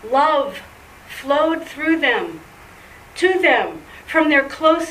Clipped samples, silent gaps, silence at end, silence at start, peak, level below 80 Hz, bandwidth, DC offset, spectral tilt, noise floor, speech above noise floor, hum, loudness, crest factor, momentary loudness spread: under 0.1%; none; 0 s; 0.05 s; -2 dBFS; -52 dBFS; 15.5 kHz; under 0.1%; -3.5 dB/octave; -42 dBFS; 25 dB; none; -17 LUFS; 18 dB; 20 LU